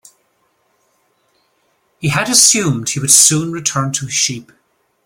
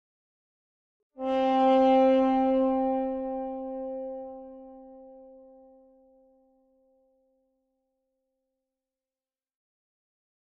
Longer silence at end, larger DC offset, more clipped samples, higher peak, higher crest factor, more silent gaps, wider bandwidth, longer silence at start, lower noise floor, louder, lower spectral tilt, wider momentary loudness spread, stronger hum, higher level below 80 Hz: second, 0.65 s vs 5.45 s; neither; neither; first, 0 dBFS vs -14 dBFS; about the same, 18 dB vs 16 dB; neither; first, over 20 kHz vs 6.4 kHz; first, 2 s vs 1.2 s; second, -62 dBFS vs under -90 dBFS; first, -12 LUFS vs -25 LUFS; second, -2 dB/octave vs -6.5 dB/octave; second, 11 LU vs 23 LU; neither; first, -54 dBFS vs -62 dBFS